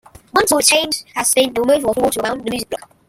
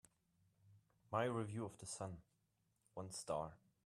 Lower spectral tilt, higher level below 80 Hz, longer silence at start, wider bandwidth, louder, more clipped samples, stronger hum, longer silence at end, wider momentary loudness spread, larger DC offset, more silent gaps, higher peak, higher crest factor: second, -1.5 dB/octave vs -5 dB/octave; first, -50 dBFS vs -76 dBFS; second, 0.35 s vs 0.65 s; first, 16.5 kHz vs 13 kHz; first, -16 LUFS vs -46 LUFS; neither; neither; about the same, 0.3 s vs 0.3 s; about the same, 11 LU vs 13 LU; neither; neither; first, 0 dBFS vs -26 dBFS; about the same, 18 dB vs 22 dB